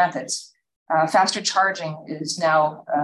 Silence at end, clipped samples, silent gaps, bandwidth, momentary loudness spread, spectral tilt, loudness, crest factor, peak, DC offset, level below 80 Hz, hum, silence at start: 0 s; under 0.1%; 0.76-0.86 s; 12.5 kHz; 11 LU; -3 dB/octave; -21 LUFS; 16 dB; -6 dBFS; under 0.1%; -72 dBFS; none; 0 s